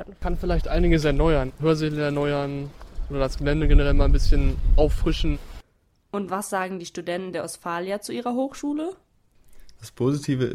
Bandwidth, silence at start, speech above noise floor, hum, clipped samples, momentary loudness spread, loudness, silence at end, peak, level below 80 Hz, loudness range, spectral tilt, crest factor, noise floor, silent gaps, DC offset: 12.5 kHz; 0 s; 43 dB; none; under 0.1%; 11 LU; -25 LUFS; 0 s; -4 dBFS; -24 dBFS; 6 LU; -6.5 dB/octave; 18 dB; -64 dBFS; none; under 0.1%